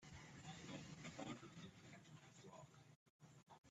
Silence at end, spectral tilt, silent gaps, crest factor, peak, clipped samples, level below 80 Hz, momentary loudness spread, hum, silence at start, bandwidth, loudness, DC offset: 0 s; -4.5 dB/octave; 2.96-3.20 s, 3.58-3.64 s; 20 dB; -40 dBFS; under 0.1%; -80 dBFS; 14 LU; none; 0 s; 12 kHz; -58 LUFS; under 0.1%